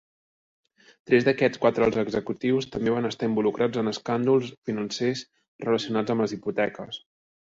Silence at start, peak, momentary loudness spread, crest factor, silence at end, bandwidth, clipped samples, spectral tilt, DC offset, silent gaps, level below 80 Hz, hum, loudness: 1.1 s; -8 dBFS; 9 LU; 18 dB; 0.45 s; 7.8 kHz; under 0.1%; -6 dB/octave; under 0.1%; 4.57-4.62 s, 5.48-5.59 s; -60 dBFS; none; -25 LUFS